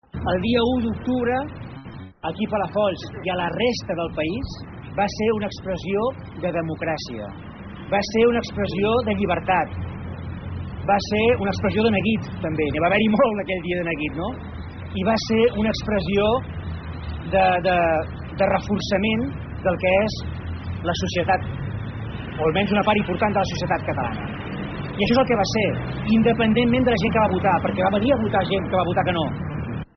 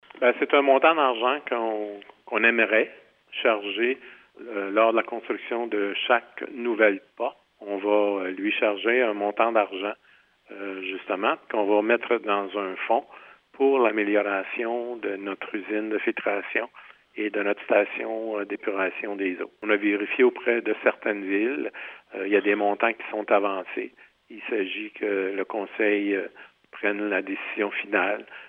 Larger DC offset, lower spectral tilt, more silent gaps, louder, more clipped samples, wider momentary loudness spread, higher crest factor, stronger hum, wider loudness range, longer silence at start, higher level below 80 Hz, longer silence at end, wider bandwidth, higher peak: neither; second, -4.5 dB/octave vs -7 dB/octave; neither; first, -22 LUFS vs -25 LUFS; neither; about the same, 13 LU vs 11 LU; about the same, 16 dB vs 20 dB; neither; about the same, 5 LU vs 3 LU; about the same, 0.15 s vs 0.15 s; first, -42 dBFS vs -80 dBFS; about the same, 0.1 s vs 0 s; first, 6.4 kHz vs 4 kHz; about the same, -6 dBFS vs -4 dBFS